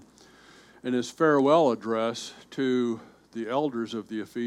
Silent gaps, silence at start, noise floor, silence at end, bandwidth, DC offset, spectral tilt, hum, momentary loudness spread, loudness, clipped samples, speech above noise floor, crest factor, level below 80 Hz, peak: none; 0.85 s; -54 dBFS; 0 s; 13 kHz; under 0.1%; -5.5 dB/octave; none; 16 LU; -26 LUFS; under 0.1%; 28 dB; 18 dB; -72 dBFS; -8 dBFS